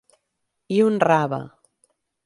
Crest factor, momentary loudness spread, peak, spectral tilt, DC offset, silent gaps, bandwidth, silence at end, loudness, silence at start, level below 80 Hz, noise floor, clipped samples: 20 dB; 14 LU; -4 dBFS; -7 dB/octave; under 0.1%; none; 11.5 kHz; 0.75 s; -20 LUFS; 0.7 s; -68 dBFS; -77 dBFS; under 0.1%